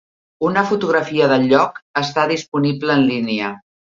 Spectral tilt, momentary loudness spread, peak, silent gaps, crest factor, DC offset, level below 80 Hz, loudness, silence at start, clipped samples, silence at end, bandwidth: -6 dB/octave; 8 LU; 0 dBFS; 1.82-1.94 s, 2.48-2.52 s; 18 dB; under 0.1%; -60 dBFS; -17 LUFS; 0.4 s; under 0.1%; 0.2 s; 7.6 kHz